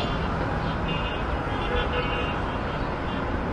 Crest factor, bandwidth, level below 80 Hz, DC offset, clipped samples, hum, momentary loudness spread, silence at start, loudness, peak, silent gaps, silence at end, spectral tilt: 14 dB; 10.5 kHz; -34 dBFS; under 0.1%; under 0.1%; none; 3 LU; 0 s; -27 LUFS; -14 dBFS; none; 0 s; -7 dB/octave